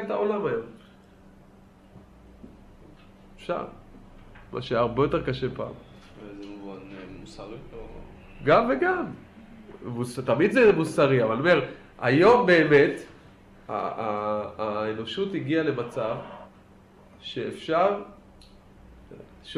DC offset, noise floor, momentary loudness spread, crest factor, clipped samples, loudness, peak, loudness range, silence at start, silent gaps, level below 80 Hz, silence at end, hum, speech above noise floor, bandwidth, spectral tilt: under 0.1%; -53 dBFS; 24 LU; 20 dB; under 0.1%; -24 LUFS; -6 dBFS; 16 LU; 0 s; none; -54 dBFS; 0 s; none; 28 dB; 12 kHz; -6.5 dB/octave